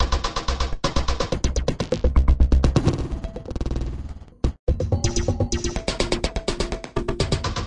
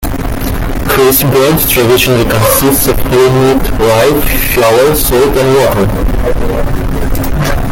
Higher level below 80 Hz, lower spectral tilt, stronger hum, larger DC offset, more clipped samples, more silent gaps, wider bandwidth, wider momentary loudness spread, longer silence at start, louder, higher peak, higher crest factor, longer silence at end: second, -24 dBFS vs -18 dBFS; about the same, -5 dB/octave vs -4.5 dB/octave; neither; neither; neither; first, 4.59-4.67 s vs none; second, 10.5 kHz vs 17.5 kHz; about the same, 10 LU vs 8 LU; about the same, 0 s vs 0 s; second, -24 LUFS vs -9 LUFS; second, -6 dBFS vs 0 dBFS; first, 16 dB vs 8 dB; about the same, 0 s vs 0 s